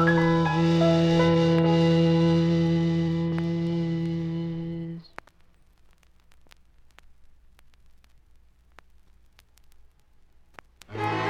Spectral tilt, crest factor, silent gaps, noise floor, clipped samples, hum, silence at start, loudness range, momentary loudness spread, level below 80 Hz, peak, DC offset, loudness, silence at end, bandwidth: -7.5 dB/octave; 16 dB; none; -57 dBFS; under 0.1%; none; 0 s; 18 LU; 12 LU; -54 dBFS; -10 dBFS; under 0.1%; -23 LUFS; 0 s; 7.6 kHz